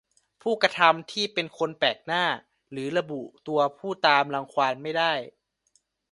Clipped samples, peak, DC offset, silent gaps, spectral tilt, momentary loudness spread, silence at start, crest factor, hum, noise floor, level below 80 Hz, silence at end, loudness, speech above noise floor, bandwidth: under 0.1%; -2 dBFS; under 0.1%; none; -4 dB/octave; 14 LU; 0.45 s; 24 dB; none; -70 dBFS; -74 dBFS; 0.8 s; -25 LUFS; 44 dB; 11.5 kHz